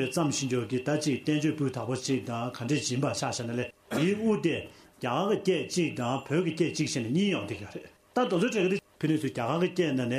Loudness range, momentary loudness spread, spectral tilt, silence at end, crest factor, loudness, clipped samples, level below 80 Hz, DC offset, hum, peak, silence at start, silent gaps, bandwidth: 1 LU; 7 LU; -5 dB/octave; 0 s; 16 dB; -29 LUFS; under 0.1%; -66 dBFS; under 0.1%; none; -14 dBFS; 0 s; none; 15.5 kHz